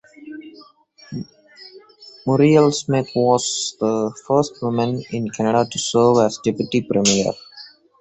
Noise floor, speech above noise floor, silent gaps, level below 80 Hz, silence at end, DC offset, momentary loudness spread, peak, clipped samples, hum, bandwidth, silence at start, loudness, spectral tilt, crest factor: -49 dBFS; 31 dB; none; -56 dBFS; 0.35 s; under 0.1%; 20 LU; -2 dBFS; under 0.1%; none; 8.2 kHz; 0.2 s; -18 LUFS; -5 dB/octave; 18 dB